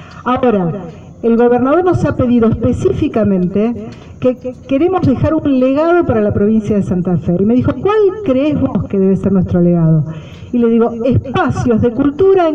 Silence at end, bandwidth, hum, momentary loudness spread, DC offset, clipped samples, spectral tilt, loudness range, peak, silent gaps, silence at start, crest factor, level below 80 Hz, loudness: 0 s; 8.2 kHz; none; 7 LU; under 0.1%; under 0.1%; -9 dB/octave; 1 LU; -2 dBFS; none; 0 s; 10 dB; -36 dBFS; -13 LUFS